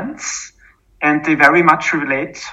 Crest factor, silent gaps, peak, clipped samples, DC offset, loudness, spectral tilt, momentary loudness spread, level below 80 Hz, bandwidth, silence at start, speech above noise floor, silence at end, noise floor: 16 dB; none; 0 dBFS; 0.2%; under 0.1%; -14 LUFS; -4 dB/octave; 14 LU; -54 dBFS; 12.5 kHz; 0 s; 32 dB; 0 s; -47 dBFS